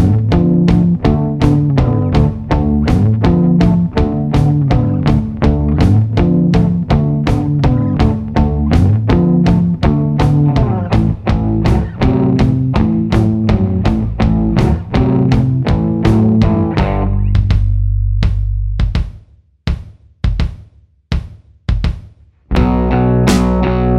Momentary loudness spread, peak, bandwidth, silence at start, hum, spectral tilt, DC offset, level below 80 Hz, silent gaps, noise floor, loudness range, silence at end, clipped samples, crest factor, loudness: 7 LU; 0 dBFS; 11 kHz; 0 s; none; -8.5 dB/octave; under 0.1%; -20 dBFS; none; -44 dBFS; 7 LU; 0 s; under 0.1%; 12 dB; -13 LUFS